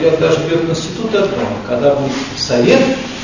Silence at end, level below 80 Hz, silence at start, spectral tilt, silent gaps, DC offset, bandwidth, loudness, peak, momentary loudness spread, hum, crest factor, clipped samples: 0 s; -42 dBFS; 0 s; -5 dB/octave; none; under 0.1%; 7.4 kHz; -14 LUFS; 0 dBFS; 8 LU; none; 14 dB; under 0.1%